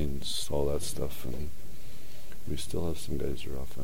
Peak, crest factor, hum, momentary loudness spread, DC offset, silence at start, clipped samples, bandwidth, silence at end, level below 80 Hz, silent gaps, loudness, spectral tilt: -14 dBFS; 18 dB; none; 18 LU; 5%; 0 s; under 0.1%; 16.5 kHz; 0 s; -44 dBFS; none; -35 LUFS; -5 dB/octave